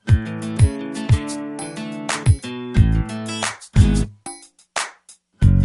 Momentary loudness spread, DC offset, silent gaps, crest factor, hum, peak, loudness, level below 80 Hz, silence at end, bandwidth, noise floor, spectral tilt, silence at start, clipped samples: 12 LU; under 0.1%; none; 18 dB; none; -2 dBFS; -21 LUFS; -26 dBFS; 0 s; 11.5 kHz; -50 dBFS; -6 dB/octave; 0.05 s; under 0.1%